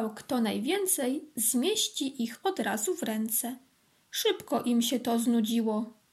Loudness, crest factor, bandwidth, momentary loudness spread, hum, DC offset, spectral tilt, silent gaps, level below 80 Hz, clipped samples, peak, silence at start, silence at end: -29 LUFS; 14 dB; 15.5 kHz; 6 LU; none; under 0.1%; -3 dB/octave; none; -80 dBFS; under 0.1%; -14 dBFS; 0 s; 0.2 s